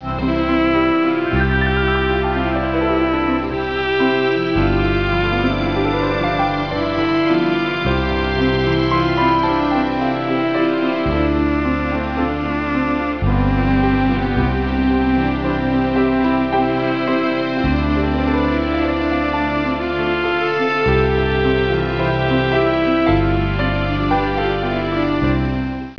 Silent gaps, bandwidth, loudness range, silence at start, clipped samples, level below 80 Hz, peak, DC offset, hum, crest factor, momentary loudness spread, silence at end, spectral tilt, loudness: none; 5.4 kHz; 1 LU; 0 s; under 0.1%; -28 dBFS; -4 dBFS; 0.6%; none; 14 dB; 3 LU; 0 s; -8 dB/octave; -18 LUFS